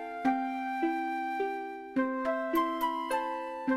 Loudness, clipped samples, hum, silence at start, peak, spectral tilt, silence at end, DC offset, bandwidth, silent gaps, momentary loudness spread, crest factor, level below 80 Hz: -32 LUFS; under 0.1%; none; 0 s; -16 dBFS; -4.5 dB/octave; 0 s; under 0.1%; 16 kHz; none; 5 LU; 16 dB; -68 dBFS